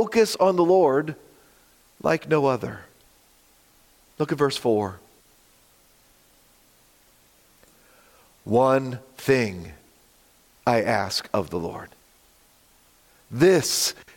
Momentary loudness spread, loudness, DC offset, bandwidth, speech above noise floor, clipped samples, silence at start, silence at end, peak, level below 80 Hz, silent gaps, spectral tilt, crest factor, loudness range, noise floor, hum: 17 LU; -23 LUFS; under 0.1%; 17 kHz; 36 dB; under 0.1%; 0 s; 0.25 s; -6 dBFS; -62 dBFS; none; -4.5 dB/octave; 18 dB; 5 LU; -58 dBFS; none